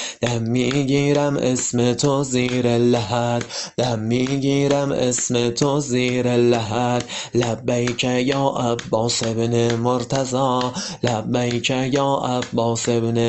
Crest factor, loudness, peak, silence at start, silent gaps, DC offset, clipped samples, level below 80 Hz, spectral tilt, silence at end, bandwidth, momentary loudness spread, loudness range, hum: 16 dB; -20 LUFS; -4 dBFS; 0 s; none; under 0.1%; under 0.1%; -52 dBFS; -5 dB/octave; 0 s; 8.6 kHz; 5 LU; 2 LU; none